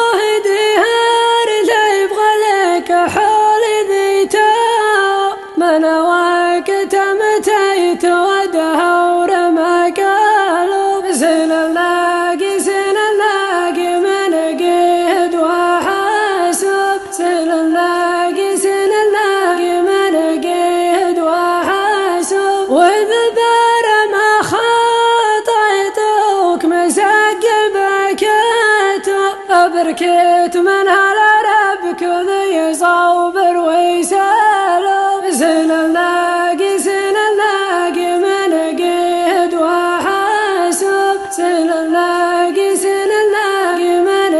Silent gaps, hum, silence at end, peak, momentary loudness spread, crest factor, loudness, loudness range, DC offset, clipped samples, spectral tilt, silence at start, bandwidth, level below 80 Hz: none; none; 0 s; 0 dBFS; 4 LU; 12 dB; -13 LUFS; 2 LU; 0.1%; under 0.1%; -2 dB/octave; 0 s; 12.5 kHz; -56 dBFS